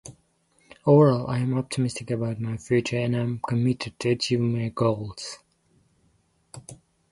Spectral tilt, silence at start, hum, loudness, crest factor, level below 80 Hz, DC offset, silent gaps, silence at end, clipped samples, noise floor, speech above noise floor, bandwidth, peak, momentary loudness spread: -6.5 dB/octave; 0.05 s; none; -25 LUFS; 20 dB; -58 dBFS; under 0.1%; none; 0.4 s; under 0.1%; -66 dBFS; 42 dB; 11.5 kHz; -6 dBFS; 18 LU